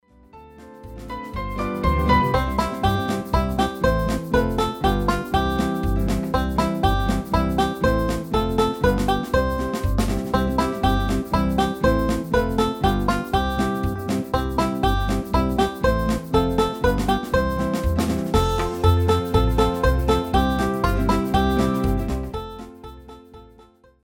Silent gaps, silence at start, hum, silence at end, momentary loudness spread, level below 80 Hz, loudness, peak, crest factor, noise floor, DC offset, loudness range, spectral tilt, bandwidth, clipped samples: none; 0.35 s; none; 0.6 s; 5 LU; -28 dBFS; -22 LUFS; -4 dBFS; 16 dB; -52 dBFS; under 0.1%; 2 LU; -6.5 dB/octave; 17.5 kHz; under 0.1%